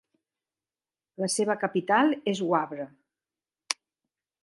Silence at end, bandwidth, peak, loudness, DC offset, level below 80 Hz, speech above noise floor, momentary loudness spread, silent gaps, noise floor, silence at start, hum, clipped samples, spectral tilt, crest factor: 0.7 s; 11.5 kHz; -4 dBFS; -27 LUFS; under 0.1%; -82 dBFS; over 64 dB; 12 LU; none; under -90 dBFS; 1.2 s; none; under 0.1%; -4 dB/octave; 26 dB